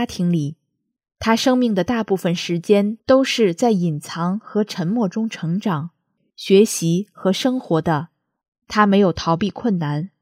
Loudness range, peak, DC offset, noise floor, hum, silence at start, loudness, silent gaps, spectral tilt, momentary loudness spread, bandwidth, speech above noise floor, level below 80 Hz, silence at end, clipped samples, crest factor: 2 LU; -2 dBFS; under 0.1%; -75 dBFS; none; 0 s; -19 LUFS; 8.48-8.52 s; -5.5 dB/octave; 9 LU; 16 kHz; 56 dB; -54 dBFS; 0.15 s; under 0.1%; 18 dB